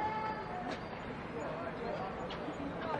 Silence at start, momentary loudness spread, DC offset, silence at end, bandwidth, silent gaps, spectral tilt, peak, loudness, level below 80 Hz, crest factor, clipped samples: 0 s; 4 LU; under 0.1%; 0 s; 11 kHz; none; -6.5 dB/octave; -24 dBFS; -41 LUFS; -58 dBFS; 16 dB; under 0.1%